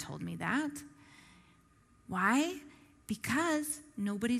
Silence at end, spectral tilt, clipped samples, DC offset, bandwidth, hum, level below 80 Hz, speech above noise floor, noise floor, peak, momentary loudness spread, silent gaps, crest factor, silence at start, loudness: 0 s; -4 dB/octave; under 0.1%; under 0.1%; 15.5 kHz; none; -68 dBFS; 31 dB; -65 dBFS; -14 dBFS; 18 LU; none; 22 dB; 0 s; -34 LUFS